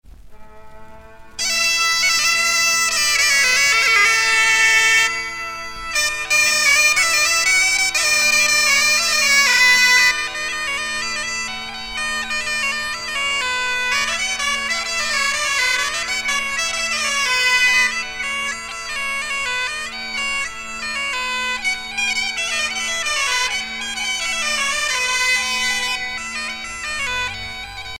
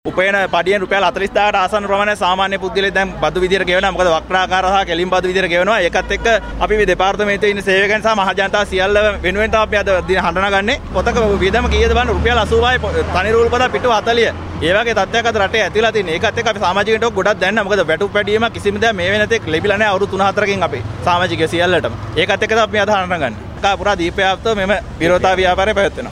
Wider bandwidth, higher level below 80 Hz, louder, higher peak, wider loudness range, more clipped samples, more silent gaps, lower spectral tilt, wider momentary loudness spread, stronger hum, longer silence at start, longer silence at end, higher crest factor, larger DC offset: first, over 20 kHz vs 12.5 kHz; second, -46 dBFS vs -30 dBFS; about the same, -16 LUFS vs -15 LUFS; second, -4 dBFS vs 0 dBFS; first, 8 LU vs 1 LU; neither; neither; second, 1.5 dB/octave vs -4.5 dB/octave; first, 12 LU vs 3 LU; neither; about the same, 0.05 s vs 0.05 s; about the same, 0 s vs 0 s; about the same, 16 dB vs 14 dB; neither